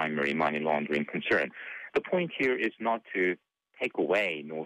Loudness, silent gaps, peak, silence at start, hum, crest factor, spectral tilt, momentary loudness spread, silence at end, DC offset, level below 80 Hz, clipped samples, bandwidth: -29 LUFS; none; -16 dBFS; 0 s; none; 14 dB; -6 dB/octave; 6 LU; 0 s; under 0.1%; -70 dBFS; under 0.1%; 10 kHz